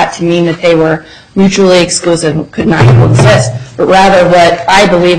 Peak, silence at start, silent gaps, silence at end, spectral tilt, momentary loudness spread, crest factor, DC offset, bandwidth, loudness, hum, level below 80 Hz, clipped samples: 0 dBFS; 0 s; none; 0 s; -5.5 dB/octave; 8 LU; 6 dB; under 0.1%; 11 kHz; -7 LUFS; none; -32 dBFS; 0.3%